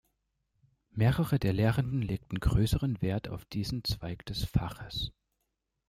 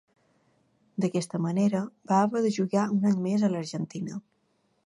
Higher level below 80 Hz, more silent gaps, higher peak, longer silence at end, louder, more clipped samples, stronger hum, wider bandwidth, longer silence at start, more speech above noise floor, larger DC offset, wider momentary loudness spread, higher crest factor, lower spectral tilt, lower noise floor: first, -42 dBFS vs -74 dBFS; neither; about the same, -12 dBFS vs -10 dBFS; first, 0.8 s vs 0.65 s; second, -32 LUFS vs -27 LUFS; neither; neither; first, 16 kHz vs 11.5 kHz; about the same, 0.95 s vs 1 s; first, 52 dB vs 45 dB; neither; about the same, 10 LU vs 11 LU; about the same, 20 dB vs 18 dB; about the same, -6.5 dB/octave vs -7 dB/octave; first, -83 dBFS vs -71 dBFS